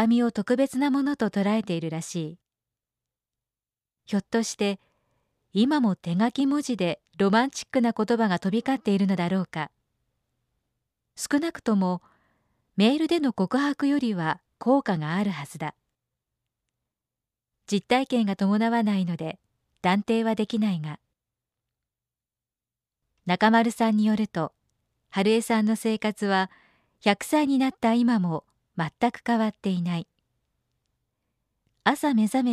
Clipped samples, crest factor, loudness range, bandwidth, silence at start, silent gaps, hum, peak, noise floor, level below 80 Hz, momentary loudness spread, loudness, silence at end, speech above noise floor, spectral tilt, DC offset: under 0.1%; 20 dB; 6 LU; 14 kHz; 0 s; none; none; -6 dBFS; under -90 dBFS; -68 dBFS; 11 LU; -25 LUFS; 0 s; over 66 dB; -6 dB/octave; under 0.1%